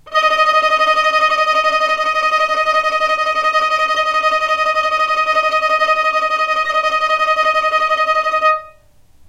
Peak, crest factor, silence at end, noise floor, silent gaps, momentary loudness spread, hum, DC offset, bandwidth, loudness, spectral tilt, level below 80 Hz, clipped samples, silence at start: -2 dBFS; 12 dB; 0.6 s; -47 dBFS; none; 3 LU; none; under 0.1%; 14.5 kHz; -14 LUFS; -0.5 dB/octave; -52 dBFS; under 0.1%; 0.05 s